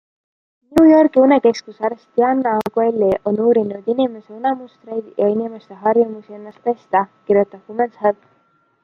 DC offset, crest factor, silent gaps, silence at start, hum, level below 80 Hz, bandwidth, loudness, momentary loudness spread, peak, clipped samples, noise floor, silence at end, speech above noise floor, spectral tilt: under 0.1%; 16 dB; none; 0.7 s; none; -56 dBFS; 9.6 kHz; -17 LUFS; 13 LU; -2 dBFS; under 0.1%; -60 dBFS; 0.7 s; 42 dB; -7 dB/octave